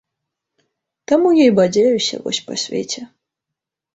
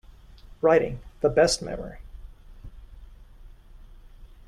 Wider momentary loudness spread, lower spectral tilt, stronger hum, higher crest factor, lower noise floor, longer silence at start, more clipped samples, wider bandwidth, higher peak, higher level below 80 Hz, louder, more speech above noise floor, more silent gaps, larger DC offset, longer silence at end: second, 12 LU vs 18 LU; about the same, -4.5 dB/octave vs -4 dB/octave; neither; about the same, 16 dB vs 20 dB; first, -83 dBFS vs -48 dBFS; first, 1.1 s vs 0.45 s; neither; second, 8.2 kHz vs 13 kHz; first, -2 dBFS vs -8 dBFS; second, -60 dBFS vs -44 dBFS; first, -16 LUFS vs -24 LUFS; first, 68 dB vs 25 dB; neither; neither; first, 0.9 s vs 0.2 s